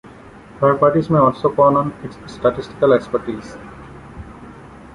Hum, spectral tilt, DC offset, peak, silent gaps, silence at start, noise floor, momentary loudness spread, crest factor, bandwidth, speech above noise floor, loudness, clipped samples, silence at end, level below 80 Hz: none; -8.5 dB/octave; under 0.1%; -2 dBFS; none; 0.55 s; -40 dBFS; 23 LU; 16 dB; 11 kHz; 24 dB; -16 LUFS; under 0.1%; 0.2 s; -46 dBFS